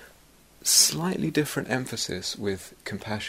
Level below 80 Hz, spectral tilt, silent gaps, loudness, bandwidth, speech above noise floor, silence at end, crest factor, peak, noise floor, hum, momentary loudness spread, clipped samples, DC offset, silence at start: -58 dBFS; -2.5 dB/octave; none; -24 LUFS; 16 kHz; 29 dB; 0 s; 22 dB; -6 dBFS; -56 dBFS; none; 16 LU; under 0.1%; under 0.1%; 0 s